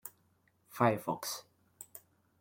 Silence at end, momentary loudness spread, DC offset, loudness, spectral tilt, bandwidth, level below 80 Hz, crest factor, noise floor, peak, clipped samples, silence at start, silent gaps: 0.45 s; 22 LU; under 0.1%; -34 LUFS; -5 dB/octave; 17 kHz; -78 dBFS; 26 dB; -72 dBFS; -12 dBFS; under 0.1%; 0.05 s; none